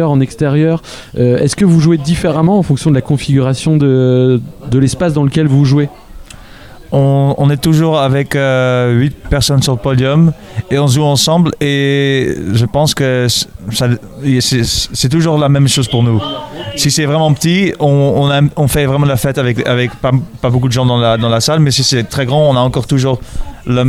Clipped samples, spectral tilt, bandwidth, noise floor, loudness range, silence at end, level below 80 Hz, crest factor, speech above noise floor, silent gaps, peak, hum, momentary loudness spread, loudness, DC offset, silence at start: under 0.1%; -5.5 dB/octave; 15 kHz; -33 dBFS; 1 LU; 0 s; -32 dBFS; 12 dB; 22 dB; none; 0 dBFS; none; 5 LU; -12 LUFS; 0.2%; 0 s